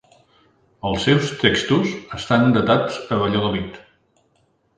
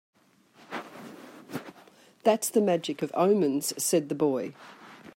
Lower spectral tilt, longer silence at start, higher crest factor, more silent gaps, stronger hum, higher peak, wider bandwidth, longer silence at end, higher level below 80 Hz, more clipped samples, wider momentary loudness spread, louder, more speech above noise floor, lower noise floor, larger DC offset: about the same, -5.5 dB/octave vs -4.5 dB/octave; first, 0.85 s vs 0.7 s; about the same, 20 dB vs 20 dB; neither; neither; first, 0 dBFS vs -10 dBFS; second, 9.8 kHz vs 16 kHz; first, 1 s vs 0.05 s; first, -46 dBFS vs -80 dBFS; neither; second, 11 LU vs 23 LU; first, -19 LUFS vs -26 LUFS; first, 44 dB vs 34 dB; about the same, -63 dBFS vs -60 dBFS; neither